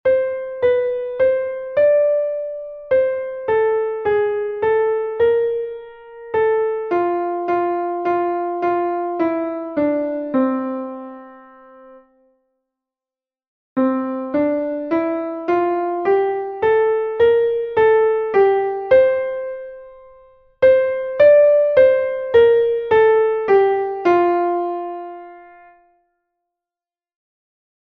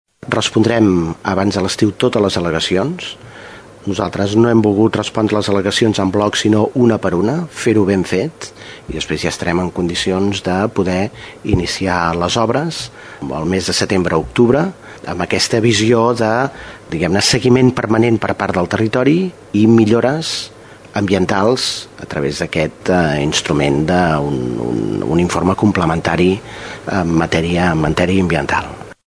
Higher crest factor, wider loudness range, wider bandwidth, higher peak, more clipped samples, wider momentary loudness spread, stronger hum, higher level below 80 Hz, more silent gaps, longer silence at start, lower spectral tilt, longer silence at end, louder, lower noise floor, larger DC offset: about the same, 16 dB vs 16 dB; first, 10 LU vs 4 LU; second, 5 kHz vs 11 kHz; about the same, -2 dBFS vs 0 dBFS; neither; about the same, 11 LU vs 12 LU; neither; second, -56 dBFS vs -40 dBFS; first, 13.47-13.76 s vs none; second, 0.05 s vs 0.25 s; first, -7.5 dB/octave vs -5.5 dB/octave; first, 2.45 s vs 0.15 s; second, -18 LUFS vs -15 LUFS; first, under -90 dBFS vs -36 dBFS; neither